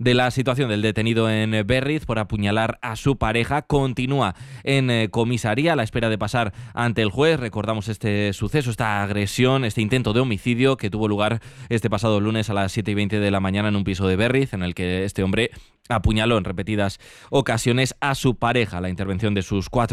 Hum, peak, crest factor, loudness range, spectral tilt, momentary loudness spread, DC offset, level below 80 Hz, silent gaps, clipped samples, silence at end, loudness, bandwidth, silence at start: none; -6 dBFS; 16 dB; 1 LU; -6 dB/octave; 6 LU; under 0.1%; -42 dBFS; none; under 0.1%; 0 s; -22 LUFS; 13.5 kHz; 0 s